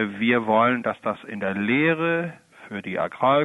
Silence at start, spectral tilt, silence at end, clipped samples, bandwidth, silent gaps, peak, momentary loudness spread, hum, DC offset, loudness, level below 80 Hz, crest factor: 0 s; -7.5 dB/octave; 0 s; under 0.1%; 11 kHz; none; -6 dBFS; 11 LU; none; under 0.1%; -23 LUFS; -64 dBFS; 16 dB